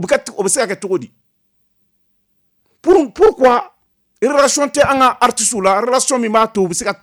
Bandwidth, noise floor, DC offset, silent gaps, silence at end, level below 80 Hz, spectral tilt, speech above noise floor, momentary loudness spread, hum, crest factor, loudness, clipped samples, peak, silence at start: 20 kHz; -63 dBFS; under 0.1%; none; 0.1 s; -48 dBFS; -3 dB/octave; 49 dB; 7 LU; none; 12 dB; -14 LUFS; under 0.1%; -2 dBFS; 0 s